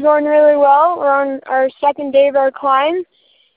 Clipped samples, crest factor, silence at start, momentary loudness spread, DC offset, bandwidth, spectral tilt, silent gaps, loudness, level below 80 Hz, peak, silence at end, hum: under 0.1%; 12 dB; 0 s; 8 LU; under 0.1%; 4.3 kHz; -8 dB/octave; none; -13 LUFS; -64 dBFS; 0 dBFS; 0.55 s; none